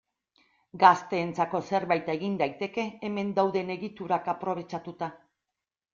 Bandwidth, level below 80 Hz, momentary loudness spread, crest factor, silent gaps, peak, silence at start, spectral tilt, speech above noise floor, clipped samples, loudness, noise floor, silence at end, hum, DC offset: 7.6 kHz; -72 dBFS; 14 LU; 24 dB; none; -4 dBFS; 0.75 s; -6 dB/octave; 60 dB; under 0.1%; -28 LUFS; -88 dBFS; 0.8 s; none; under 0.1%